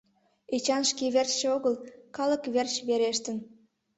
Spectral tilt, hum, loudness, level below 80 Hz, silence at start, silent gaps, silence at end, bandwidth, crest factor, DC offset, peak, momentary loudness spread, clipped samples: -2 dB/octave; none; -28 LUFS; -74 dBFS; 0.5 s; none; 0.5 s; 8.4 kHz; 18 dB; under 0.1%; -12 dBFS; 10 LU; under 0.1%